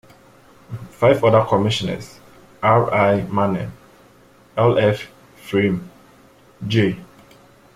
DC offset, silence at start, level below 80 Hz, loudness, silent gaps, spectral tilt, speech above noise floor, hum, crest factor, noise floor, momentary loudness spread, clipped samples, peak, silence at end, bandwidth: under 0.1%; 0.7 s; -52 dBFS; -18 LUFS; none; -7 dB/octave; 33 dB; none; 18 dB; -50 dBFS; 18 LU; under 0.1%; -2 dBFS; 0.7 s; 15 kHz